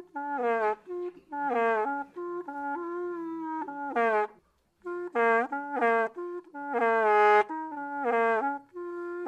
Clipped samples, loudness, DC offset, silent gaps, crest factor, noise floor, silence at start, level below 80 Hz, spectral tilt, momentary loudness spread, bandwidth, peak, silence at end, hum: under 0.1%; -29 LUFS; under 0.1%; none; 18 dB; -65 dBFS; 0 s; -78 dBFS; -5 dB/octave; 14 LU; 9 kHz; -12 dBFS; 0 s; none